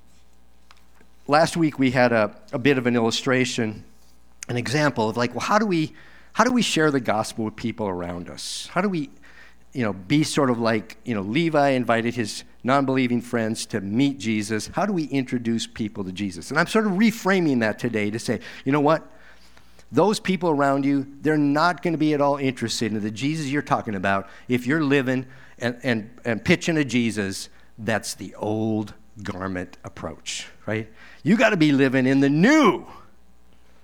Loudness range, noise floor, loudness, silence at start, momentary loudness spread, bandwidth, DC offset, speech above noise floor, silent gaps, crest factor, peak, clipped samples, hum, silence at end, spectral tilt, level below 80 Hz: 4 LU; -58 dBFS; -23 LUFS; 1.3 s; 11 LU; 17 kHz; 0.5%; 35 dB; none; 22 dB; -2 dBFS; under 0.1%; none; 0.85 s; -5.5 dB/octave; -58 dBFS